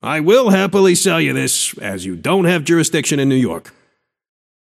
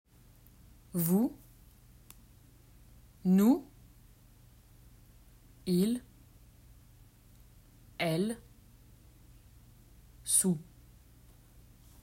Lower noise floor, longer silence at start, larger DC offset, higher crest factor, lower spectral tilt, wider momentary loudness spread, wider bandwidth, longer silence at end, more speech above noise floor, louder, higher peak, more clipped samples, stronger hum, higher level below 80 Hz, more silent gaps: first, -63 dBFS vs -59 dBFS; second, 0.05 s vs 0.95 s; neither; second, 14 dB vs 24 dB; about the same, -4 dB/octave vs -5 dB/octave; second, 10 LU vs 18 LU; about the same, 15.5 kHz vs 16 kHz; second, 1.1 s vs 1.4 s; first, 48 dB vs 31 dB; first, -15 LUFS vs -31 LUFS; first, 0 dBFS vs -12 dBFS; neither; neither; about the same, -58 dBFS vs -60 dBFS; neither